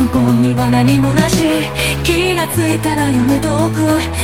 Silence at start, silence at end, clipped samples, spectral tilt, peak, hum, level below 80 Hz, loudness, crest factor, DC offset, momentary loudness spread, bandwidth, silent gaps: 0 s; 0 s; under 0.1%; -5.5 dB/octave; 0 dBFS; none; -30 dBFS; -13 LUFS; 12 dB; 0.8%; 3 LU; 17 kHz; none